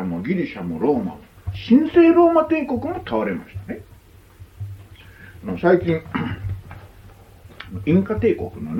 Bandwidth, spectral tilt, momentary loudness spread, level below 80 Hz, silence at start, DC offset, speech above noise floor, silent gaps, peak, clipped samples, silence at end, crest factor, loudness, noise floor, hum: 5.8 kHz; -9 dB/octave; 21 LU; -46 dBFS; 0 s; under 0.1%; 28 dB; none; -4 dBFS; under 0.1%; 0 s; 18 dB; -19 LUFS; -47 dBFS; none